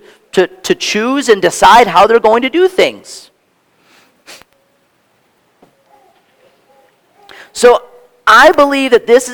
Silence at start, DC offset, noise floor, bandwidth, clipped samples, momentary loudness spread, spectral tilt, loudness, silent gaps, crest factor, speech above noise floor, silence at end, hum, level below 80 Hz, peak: 0.35 s; under 0.1%; -56 dBFS; 19.5 kHz; 1%; 11 LU; -3 dB/octave; -9 LUFS; none; 12 dB; 47 dB; 0 s; none; -46 dBFS; 0 dBFS